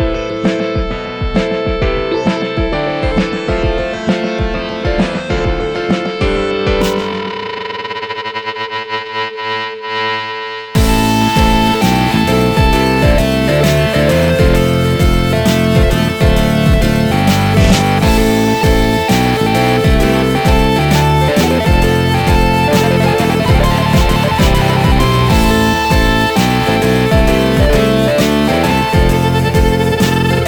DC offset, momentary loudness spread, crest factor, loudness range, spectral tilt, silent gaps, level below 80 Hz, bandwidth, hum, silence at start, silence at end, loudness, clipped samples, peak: under 0.1%; 8 LU; 10 dB; 5 LU; -5.5 dB/octave; none; -20 dBFS; 19.5 kHz; none; 0 s; 0 s; -13 LUFS; under 0.1%; -2 dBFS